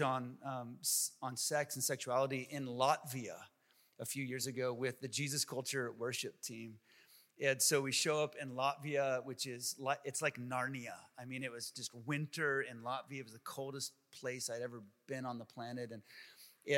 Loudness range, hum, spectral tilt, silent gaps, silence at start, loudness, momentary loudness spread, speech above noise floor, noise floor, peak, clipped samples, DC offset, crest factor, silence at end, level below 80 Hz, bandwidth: 6 LU; none; -3 dB/octave; none; 0 s; -39 LUFS; 14 LU; 26 dB; -66 dBFS; -18 dBFS; under 0.1%; under 0.1%; 22 dB; 0 s; under -90 dBFS; 16.5 kHz